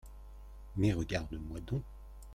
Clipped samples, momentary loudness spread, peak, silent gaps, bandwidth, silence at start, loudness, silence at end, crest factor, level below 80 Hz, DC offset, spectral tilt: under 0.1%; 21 LU; -18 dBFS; none; 14.5 kHz; 0.05 s; -37 LUFS; 0 s; 20 dB; -48 dBFS; under 0.1%; -7 dB/octave